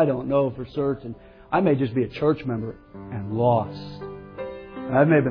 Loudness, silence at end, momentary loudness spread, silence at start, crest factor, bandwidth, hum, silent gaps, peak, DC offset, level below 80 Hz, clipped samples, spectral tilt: -24 LUFS; 0 s; 16 LU; 0 s; 18 dB; 5.4 kHz; none; none; -6 dBFS; under 0.1%; -52 dBFS; under 0.1%; -10.5 dB/octave